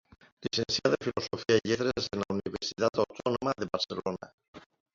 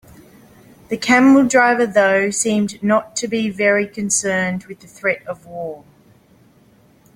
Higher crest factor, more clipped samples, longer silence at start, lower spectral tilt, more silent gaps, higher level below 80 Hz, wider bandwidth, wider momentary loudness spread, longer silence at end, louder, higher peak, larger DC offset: first, 22 dB vs 16 dB; neither; second, 0.4 s vs 0.9 s; about the same, -4.5 dB/octave vs -4 dB/octave; first, 4.34-4.38 s, 4.48-4.53 s vs none; about the same, -60 dBFS vs -58 dBFS; second, 7.6 kHz vs 15.5 kHz; second, 8 LU vs 18 LU; second, 0.35 s vs 1.4 s; second, -31 LUFS vs -16 LUFS; second, -10 dBFS vs -2 dBFS; neither